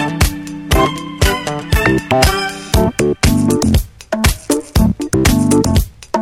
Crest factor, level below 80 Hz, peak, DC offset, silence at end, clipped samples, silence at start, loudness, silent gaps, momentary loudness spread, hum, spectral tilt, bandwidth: 14 dB; -22 dBFS; 0 dBFS; under 0.1%; 0 s; under 0.1%; 0 s; -15 LUFS; none; 6 LU; none; -5 dB/octave; 17.5 kHz